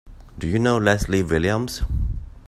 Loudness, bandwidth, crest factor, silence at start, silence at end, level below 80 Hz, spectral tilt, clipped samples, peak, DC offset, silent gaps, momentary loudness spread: -22 LUFS; 15 kHz; 20 dB; 0.05 s; 0.1 s; -30 dBFS; -6 dB/octave; under 0.1%; -2 dBFS; under 0.1%; none; 9 LU